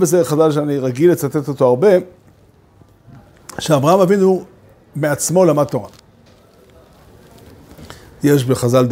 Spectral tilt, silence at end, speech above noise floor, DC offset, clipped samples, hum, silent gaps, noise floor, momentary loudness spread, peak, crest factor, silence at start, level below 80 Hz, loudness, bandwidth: -6 dB/octave; 0 s; 35 dB; under 0.1%; under 0.1%; none; none; -49 dBFS; 10 LU; 0 dBFS; 16 dB; 0 s; -52 dBFS; -15 LUFS; 16.5 kHz